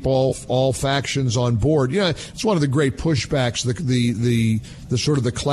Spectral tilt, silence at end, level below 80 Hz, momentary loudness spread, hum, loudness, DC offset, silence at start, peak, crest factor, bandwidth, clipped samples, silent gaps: -5.5 dB/octave; 0 s; -42 dBFS; 4 LU; none; -20 LUFS; under 0.1%; 0 s; -6 dBFS; 14 dB; 12.5 kHz; under 0.1%; none